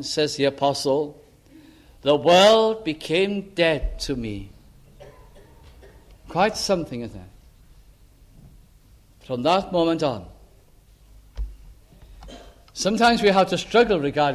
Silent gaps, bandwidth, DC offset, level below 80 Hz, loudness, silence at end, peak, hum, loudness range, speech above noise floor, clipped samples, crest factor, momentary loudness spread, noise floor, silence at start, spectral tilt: none; 15 kHz; under 0.1%; -42 dBFS; -21 LUFS; 0 s; -4 dBFS; none; 8 LU; 32 dB; under 0.1%; 20 dB; 19 LU; -53 dBFS; 0 s; -4.5 dB/octave